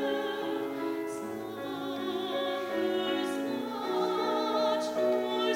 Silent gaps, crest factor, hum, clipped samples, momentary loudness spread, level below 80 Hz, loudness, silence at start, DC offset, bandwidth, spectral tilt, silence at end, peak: none; 14 dB; none; under 0.1%; 8 LU; -74 dBFS; -32 LUFS; 0 s; under 0.1%; 16 kHz; -4 dB/octave; 0 s; -18 dBFS